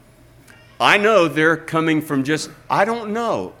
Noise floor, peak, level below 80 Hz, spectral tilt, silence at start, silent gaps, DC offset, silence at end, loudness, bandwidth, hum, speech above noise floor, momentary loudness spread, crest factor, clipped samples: -48 dBFS; 0 dBFS; -58 dBFS; -4.5 dB/octave; 0.8 s; none; under 0.1%; 0.1 s; -18 LUFS; 16.5 kHz; none; 30 dB; 9 LU; 20 dB; under 0.1%